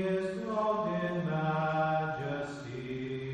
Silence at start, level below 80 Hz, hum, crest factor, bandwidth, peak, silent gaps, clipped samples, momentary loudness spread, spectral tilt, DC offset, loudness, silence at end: 0 s; -62 dBFS; none; 14 dB; 9.8 kHz; -18 dBFS; none; under 0.1%; 8 LU; -7.5 dB/octave; under 0.1%; -33 LUFS; 0 s